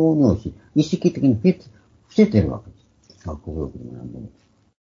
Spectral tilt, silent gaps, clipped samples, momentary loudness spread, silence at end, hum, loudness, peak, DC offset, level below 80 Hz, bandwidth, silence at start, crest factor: -8 dB/octave; none; under 0.1%; 19 LU; 0.65 s; none; -20 LUFS; -2 dBFS; under 0.1%; -42 dBFS; 7.4 kHz; 0 s; 18 dB